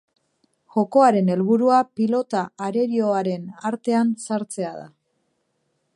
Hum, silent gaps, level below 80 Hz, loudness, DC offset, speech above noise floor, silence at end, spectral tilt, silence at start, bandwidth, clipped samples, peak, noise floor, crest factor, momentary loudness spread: none; none; -74 dBFS; -21 LUFS; under 0.1%; 51 dB; 1.1 s; -6.5 dB/octave; 0.75 s; 11.5 kHz; under 0.1%; -4 dBFS; -71 dBFS; 18 dB; 12 LU